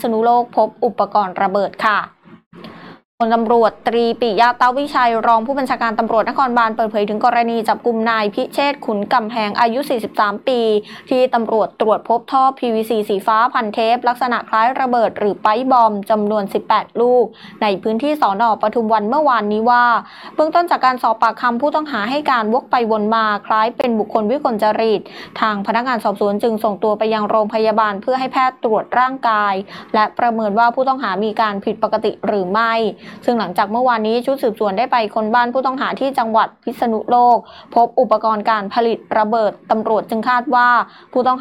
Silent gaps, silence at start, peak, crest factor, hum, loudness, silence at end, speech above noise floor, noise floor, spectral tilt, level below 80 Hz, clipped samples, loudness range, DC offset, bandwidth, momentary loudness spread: 2.46-2.51 s, 3.05-3.18 s; 0 s; -2 dBFS; 14 dB; none; -16 LUFS; 0 s; 21 dB; -37 dBFS; -6 dB/octave; -62 dBFS; under 0.1%; 2 LU; under 0.1%; 14.5 kHz; 5 LU